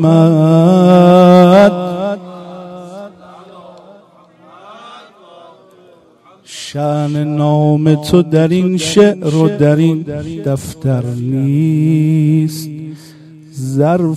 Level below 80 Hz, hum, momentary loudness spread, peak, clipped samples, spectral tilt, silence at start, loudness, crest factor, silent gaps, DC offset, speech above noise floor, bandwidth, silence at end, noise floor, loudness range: -48 dBFS; none; 23 LU; 0 dBFS; under 0.1%; -7.5 dB/octave; 0 s; -11 LUFS; 12 dB; none; under 0.1%; 34 dB; 13 kHz; 0 s; -46 dBFS; 15 LU